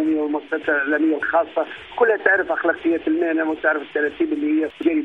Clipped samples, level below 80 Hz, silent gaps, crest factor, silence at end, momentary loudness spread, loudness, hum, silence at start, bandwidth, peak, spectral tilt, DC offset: under 0.1%; -60 dBFS; none; 18 dB; 0 s; 6 LU; -20 LUFS; none; 0 s; 3.9 kHz; -2 dBFS; -6.5 dB/octave; under 0.1%